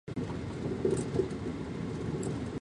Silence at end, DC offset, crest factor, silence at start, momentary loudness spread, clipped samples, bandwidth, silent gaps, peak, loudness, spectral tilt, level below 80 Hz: 0.05 s; under 0.1%; 18 dB; 0.05 s; 6 LU; under 0.1%; 11.5 kHz; none; -16 dBFS; -35 LUFS; -7 dB/octave; -50 dBFS